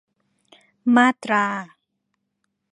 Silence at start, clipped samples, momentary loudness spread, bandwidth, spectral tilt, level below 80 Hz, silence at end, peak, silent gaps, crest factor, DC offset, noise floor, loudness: 0.85 s; under 0.1%; 11 LU; 10.5 kHz; -5 dB/octave; -78 dBFS; 1.05 s; -2 dBFS; none; 22 dB; under 0.1%; -76 dBFS; -19 LUFS